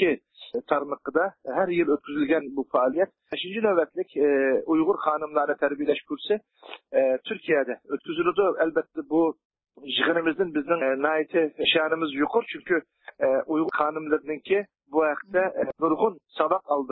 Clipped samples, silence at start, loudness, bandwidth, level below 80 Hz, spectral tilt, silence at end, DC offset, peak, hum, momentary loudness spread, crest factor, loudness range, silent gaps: under 0.1%; 0 s; -25 LUFS; 4.3 kHz; -68 dBFS; -9 dB/octave; 0 s; under 0.1%; -6 dBFS; none; 6 LU; 18 dB; 2 LU; 9.45-9.50 s